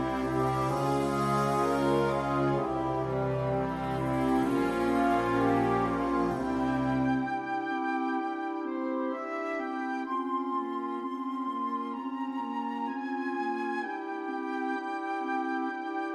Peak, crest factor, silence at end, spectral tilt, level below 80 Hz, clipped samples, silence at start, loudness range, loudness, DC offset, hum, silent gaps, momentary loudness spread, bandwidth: -16 dBFS; 14 dB; 0 s; -7 dB/octave; -54 dBFS; under 0.1%; 0 s; 5 LU; -30 LUFS; under 0.1%; none; none; 7 LU; 14 kHz